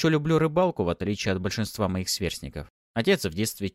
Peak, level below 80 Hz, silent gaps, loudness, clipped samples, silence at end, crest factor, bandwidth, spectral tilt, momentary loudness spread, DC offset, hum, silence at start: -8 dBFS; -48 dBFS; 2.70-2.94 s; -26 LUFS; under 0.1%; 0.05 s; 18 dB; 16 kHz; -5 dB/octave; 11 LU; under 0.1%; none; 0 s